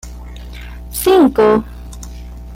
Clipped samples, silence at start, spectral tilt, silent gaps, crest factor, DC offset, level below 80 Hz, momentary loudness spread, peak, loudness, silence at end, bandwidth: under 0.1%; 0.05 s; -5 dB/octave; none; 14 dB; under 0.1%; -32 dBFS; 22 LU; -2 dBFS; -13 LUFS; 0 s; 17 kHz